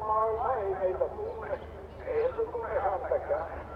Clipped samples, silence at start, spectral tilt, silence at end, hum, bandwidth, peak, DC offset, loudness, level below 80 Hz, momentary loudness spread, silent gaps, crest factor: under 0.1%; 0 s; -8.5 dB/octave; 0 s; none; 6 kHz; -16 dBFS; under 0.1%; -32 LUFS; -50 dBFS; 9 LU; none; 16 dB